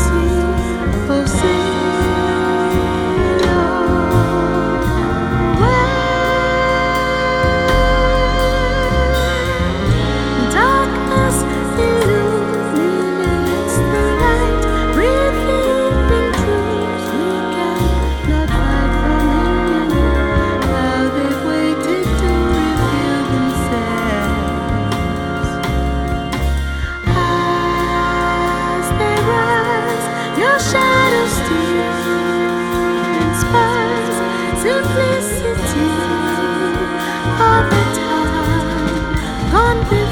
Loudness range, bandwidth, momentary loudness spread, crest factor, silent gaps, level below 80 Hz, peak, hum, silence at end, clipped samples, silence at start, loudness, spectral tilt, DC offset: 2 LU; 19 kHz; 5 LU; 14 dB; none; -24 dBFS; 0 dBFS; none; 0 s; under 0.1%; 0 s; -16 LUFS; -5.5 dB/octave; under 0.1%